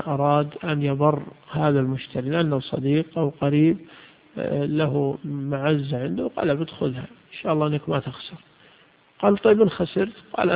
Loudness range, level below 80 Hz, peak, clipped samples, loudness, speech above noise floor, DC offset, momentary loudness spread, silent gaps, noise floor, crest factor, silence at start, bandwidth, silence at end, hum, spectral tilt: 3 LU; -58 dBFS; -4 dBFS; under 0.1%; -23 LUFS; 33 dB; under 0.1%; 11 LU; none; -56 dBFS; 18 dB; 0 s; 4.9 kHz; 0 s; none; -12 dB/octave